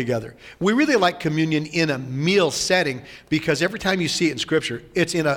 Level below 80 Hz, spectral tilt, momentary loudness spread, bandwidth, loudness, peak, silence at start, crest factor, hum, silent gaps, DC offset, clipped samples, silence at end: -54 dBFS; -4.5 dB/octave; 8 LU; 17 kHz; -21 LUFS; -6 dBFS; 0 s; 16 dB; none; none; under 0.1%; under 0.1%; 0 s